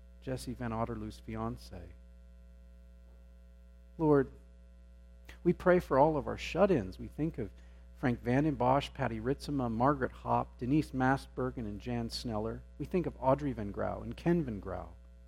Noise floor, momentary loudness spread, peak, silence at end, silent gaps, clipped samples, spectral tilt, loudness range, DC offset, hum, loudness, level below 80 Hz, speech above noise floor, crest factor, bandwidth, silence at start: -55 dBFS; 14 LU; -12 dBFS; 0 s; none; under 0.1%; -7.5 dB/octave; 6 LU; under 0.1%; 60 Hz at -50 dBFS; -33 LUFS; -50 dBFS; 23 dB; 22 dB; 16 kHz; 0 s